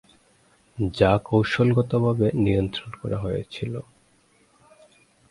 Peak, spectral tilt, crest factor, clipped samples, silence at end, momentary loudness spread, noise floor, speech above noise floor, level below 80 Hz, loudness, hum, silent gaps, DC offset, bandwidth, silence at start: -4 dBFS; -8 dB/octave; 22 dB; under 0.1%; 1.5 s; 12 LU; -61 dBFS; 39 dB; -46 dBFS; -23 LUFS; none; none; under 0.1%; 11.5 kHz; 0.75 s